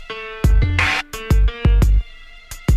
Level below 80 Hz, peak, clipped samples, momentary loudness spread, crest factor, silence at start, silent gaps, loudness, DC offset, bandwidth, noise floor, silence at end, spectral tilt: -18 dBFS; -4 dBFS; under 0.1%; 12 LU; 12 dB; 0 s; none; -18 LUFS; under 0.1%; 14.5 kHz; -38 dBFS; 0 s; -5.5 dB/octave